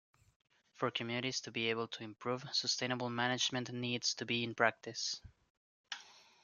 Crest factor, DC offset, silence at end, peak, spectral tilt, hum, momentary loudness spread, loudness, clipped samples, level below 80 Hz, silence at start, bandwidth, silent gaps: 26 dB; under 0.1%; 0.25 s; -14 dBFS; -3 dB/octave; none; 10 LU; -37 LUFS; under 0.1%; -76 dBFS; 0.8 s; 10 kHz; 5.50-5.84 s